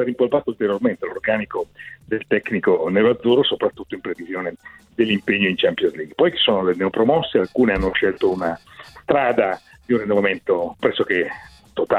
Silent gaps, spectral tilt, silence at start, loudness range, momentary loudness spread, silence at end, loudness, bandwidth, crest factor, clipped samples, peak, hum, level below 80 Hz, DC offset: none; -7 dB/octave; 0 s; 2 LU; 12 LU; 0 s; -20 LUFS; 9.8 kHz; 16 dB; under 0.1%; -4 dBFS; none; -46 dBFS; under 0.1%